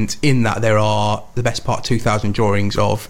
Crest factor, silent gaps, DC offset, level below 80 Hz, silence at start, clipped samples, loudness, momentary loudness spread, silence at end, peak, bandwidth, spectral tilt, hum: 14 dB; none; 5%; -36 dBFS; 0 s; under 0.1%; -18 LUFS; 5 LU; 0 s; -4 dBFS; 16 kHz; -5.5 dB/octave; none